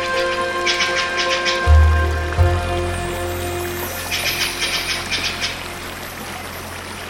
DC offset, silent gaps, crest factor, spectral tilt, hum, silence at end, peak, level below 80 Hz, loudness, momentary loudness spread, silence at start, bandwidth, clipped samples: under 0.1%; none; 16 dB; -4 dB/octave; none; 0 s; -4 dBFS; -24 dBFS; -19 LUFS; 13 LU; 0 s; 16.5 kHz; under 0.1%